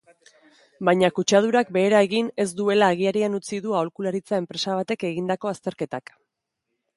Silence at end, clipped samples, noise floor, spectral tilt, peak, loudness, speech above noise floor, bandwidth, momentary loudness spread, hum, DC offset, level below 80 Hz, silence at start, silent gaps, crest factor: 1 s; under 0.1%; -80 dBFS; -5 dB/octave; -4 dBFS; -23 LUFS; 58 dB; 11.5 kHz; 10 LU; none; under 0.1%; -70 dBFS; 0.8 s; none; 20 dB